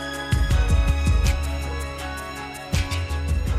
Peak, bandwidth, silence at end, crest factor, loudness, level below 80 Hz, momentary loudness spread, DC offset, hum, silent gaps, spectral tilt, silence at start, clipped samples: -8 dBFS; 15 kHz; 0 s; 14 dB; -24 LUFS; -24 dBFS; 10 LU; under 0.1%; none; none; -5 dB/octave; 0 s; under 0.1%